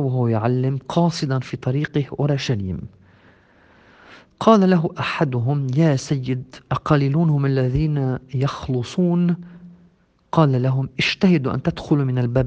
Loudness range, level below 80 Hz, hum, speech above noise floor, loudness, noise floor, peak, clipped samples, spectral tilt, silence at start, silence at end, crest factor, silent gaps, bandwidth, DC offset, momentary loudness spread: 4 LU; -46 dBFS; none; 38 dB; -20 LUFS; -57 dBFS; 0 dBFS; under 0.1%; -7.5 dB/octave; 0 s; 0 s; 20 dB; none; 8.4 kHz; under 0.1%; 7 LU